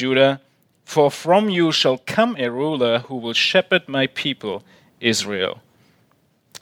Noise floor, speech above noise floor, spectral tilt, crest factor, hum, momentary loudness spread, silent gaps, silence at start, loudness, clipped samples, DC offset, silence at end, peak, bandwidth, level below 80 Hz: -61 dBFS; 42 dB; -4 dB/octave; 20 dB; none; 9 LU; none; 0 s; -19 LUFS; under 0.1%; under 0.1%; 1.05 s; -2 dBFS; 16.5 kHz; -68 dBFS